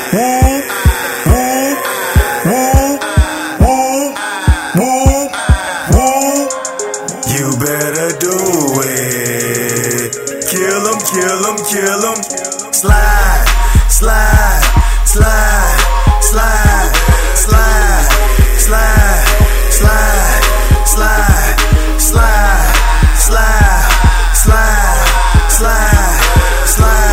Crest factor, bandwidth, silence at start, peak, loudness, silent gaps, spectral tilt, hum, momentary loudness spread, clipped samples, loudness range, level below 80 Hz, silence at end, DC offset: 10 dB; 16.5 kHz; 0 s; 0 dBFS; -11 LUFS; none; -4 dB/octave; none; 5 LU; 0.3%; 3 LU; -12 dBFS; 0 s; under 0.1%